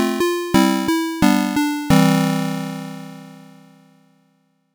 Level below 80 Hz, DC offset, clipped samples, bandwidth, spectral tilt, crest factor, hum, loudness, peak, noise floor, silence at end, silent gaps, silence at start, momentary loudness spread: -44 dBFS; under 0.1%; under 0.1%; over 20 kHz; -5.5 dB/octave; 14 dB; none; -18 LUFS; -4 dBFS; -63 dBFS; 1.35 s; none; 0 s; 18 LU